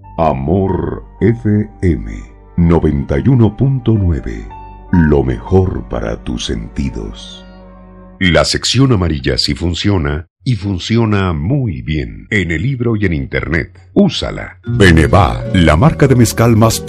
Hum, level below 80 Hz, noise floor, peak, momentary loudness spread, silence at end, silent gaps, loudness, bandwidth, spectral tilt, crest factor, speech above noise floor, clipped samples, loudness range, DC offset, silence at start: none; -26 dBFS; -36 dBFS; 0 dBFS; 12 LU; 0 s; 10.30-10.36 s; -13 LUFS; 13 kHz; -6 dB/octave; 14 dB; 24 dB; under 0.1%; 5 LU; under 0.1%; 0.05 s